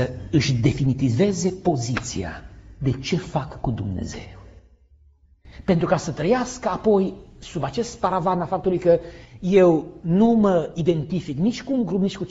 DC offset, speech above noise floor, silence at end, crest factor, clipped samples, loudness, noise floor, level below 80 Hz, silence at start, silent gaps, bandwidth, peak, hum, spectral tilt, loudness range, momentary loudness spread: under 0.1%; 34 dB; 0 s; 18 dB; under 0.1%; -22 LUFS; -55 dBFS; -44 dBFS; 0 s; none; 8 kHz; -4 dBFS; none; -6.5 dB/octave; 8 LU; 13 LU